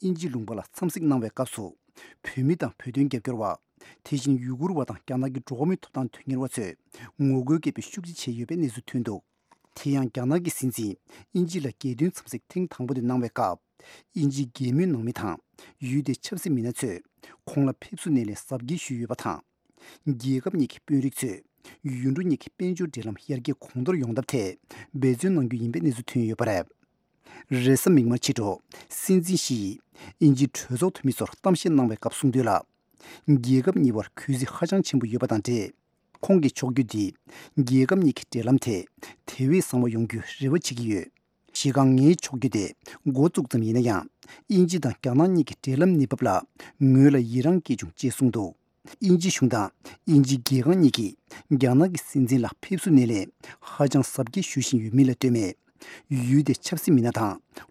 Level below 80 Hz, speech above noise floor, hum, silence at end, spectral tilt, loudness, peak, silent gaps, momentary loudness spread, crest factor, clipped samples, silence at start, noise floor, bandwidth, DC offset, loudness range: -66 dBFS; 44 dB; none; 0.1 s; -6.5 dB/octave; -25 LUFS; -4 dBFS; none; 13 LU; 22 dB; under 0.1%; 0 s; -68 dBFS; 15.5 kHz; under 0.1%; 7 LU